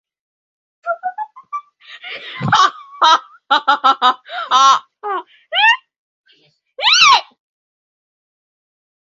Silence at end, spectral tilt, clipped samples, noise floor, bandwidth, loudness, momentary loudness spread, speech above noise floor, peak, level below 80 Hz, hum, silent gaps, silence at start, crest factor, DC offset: 2 s; -1.5 dB/octave; under 0.1%; -56 dBFS; 7.8 kHz; -13 LUFS; 20 LU; 43 dB; 0 dBFS; -62 dBFS; none; 5.98-6.24 s; 0.85 s; 18 dB; under 0.1%